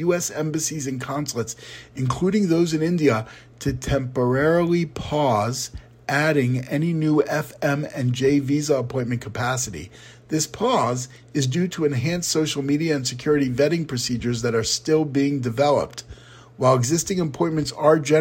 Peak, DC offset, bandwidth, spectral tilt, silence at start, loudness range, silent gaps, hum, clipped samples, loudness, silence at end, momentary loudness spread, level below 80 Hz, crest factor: -4 dBFS; under 0.1%; 16.5 kHz; -5 dB/octave; 0 s; 2 LU; none; none; under 0.1%; -22 LUFS; 0 s; 9 LU; -48 dBFS; 18 dB